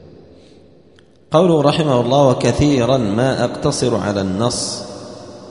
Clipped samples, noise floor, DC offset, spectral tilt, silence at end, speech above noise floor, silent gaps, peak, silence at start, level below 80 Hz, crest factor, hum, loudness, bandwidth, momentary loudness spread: under 0.1%; -49 dBFS; 0.2%; -5.5 dB/octave; 0 s; 34 dB; none; 0 dBFS; 1.3 s; -40 dBFS; 16 dB; none; -16 LUFS; 11 kHz; 14 LU